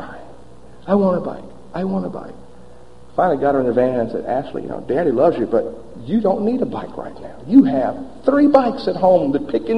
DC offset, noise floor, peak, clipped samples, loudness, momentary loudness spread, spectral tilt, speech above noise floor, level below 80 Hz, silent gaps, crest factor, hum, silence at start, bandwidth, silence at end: 1%; -44 dBFS; 0 dBFS; under 0.1%; -18 LUFS; 19 LU; -9 dB/octave; 27 dB; -48 dBFS; none; 18 dB; none; 0 s; 5.8 kHz; 0 s